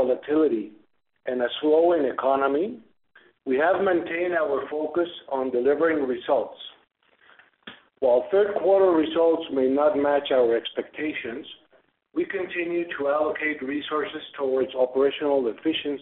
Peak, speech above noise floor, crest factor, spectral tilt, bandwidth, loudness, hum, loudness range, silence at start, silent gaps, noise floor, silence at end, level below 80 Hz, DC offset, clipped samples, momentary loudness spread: -8 dBFS; 39 dB; 16 dB; -2.5 dB/octave; 4.2 kHz; -24 LUFS; none; 5 LU; 0 s; none; -63 dBFS; 0 s; -66 dBFS; under 0.1%; under 0.1%; 11 LU